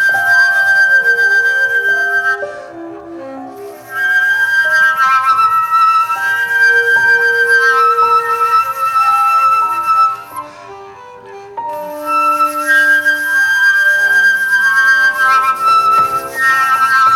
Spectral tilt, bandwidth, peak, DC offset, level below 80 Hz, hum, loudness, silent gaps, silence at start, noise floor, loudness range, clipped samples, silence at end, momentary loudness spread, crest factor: -1 dB/octave; 17 kHz; -2 dBFS; under 0.1%; -60 dBFS; none; -10 LUFS; none; 0 s; -33 dBFS; 5 LU; under 0.1%; 0 s; 16 LU; 10 dB